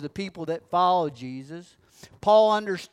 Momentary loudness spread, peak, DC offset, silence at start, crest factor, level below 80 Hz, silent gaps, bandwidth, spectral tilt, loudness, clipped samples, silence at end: 20 LU; -8 dBFS; under 0.1%; 0 s; 18 dB; -64 dBFS; none; 12 kHz; -5.5 dB/octave; -23 LUFS; under 0.1%; 0.05 s